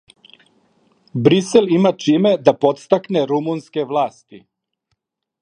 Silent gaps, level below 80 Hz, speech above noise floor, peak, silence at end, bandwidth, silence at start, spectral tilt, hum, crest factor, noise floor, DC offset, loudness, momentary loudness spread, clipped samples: none; -62 dBFS; 57 dB; 0 dBFS; 1.05 s; 11 kHz; 1.15 s; -6.5 dB/octave; none; 18 dB; -73 dBFS; under 0.1%; -17 LUFS; 9 LU; under 0.1%